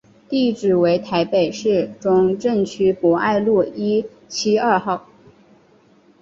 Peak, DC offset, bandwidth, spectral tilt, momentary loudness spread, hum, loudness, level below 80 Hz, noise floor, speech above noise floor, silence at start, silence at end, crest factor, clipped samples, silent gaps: -2 dBFS; under 0.1%; 7.8 kHz; -5.5 dB/octave; 6 LU; none; -19 LUFS; -58 dBFS; -53 dBFS; 35 dB; 0.3 s; 1.25 s; 16 dB; under 0.1%; none